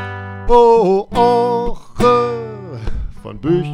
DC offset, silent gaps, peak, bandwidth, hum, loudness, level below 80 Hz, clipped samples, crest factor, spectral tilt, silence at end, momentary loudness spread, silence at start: under 0.1%; none; 0 dBFS; 11.5 kHz; none; -14 LUFS; -28 dBFS; under 0.1%; 14 dB; -7 dB/octave; 0 s; 18 LU; 0 s